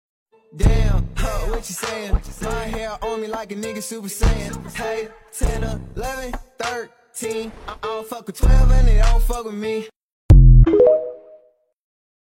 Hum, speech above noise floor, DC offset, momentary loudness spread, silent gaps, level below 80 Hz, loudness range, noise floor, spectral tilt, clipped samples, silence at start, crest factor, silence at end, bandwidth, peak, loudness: none; 35 dB; under 0.1%; 16 LU; 9.96-10.29 s; -20 dBFS; 11 LU; -54 dBFS; -6 dB/octave; under 0.1%; 0.55 s; 16 dB; 1.2 s; 15.5 kHz; -2 dBFS; -20 LUFS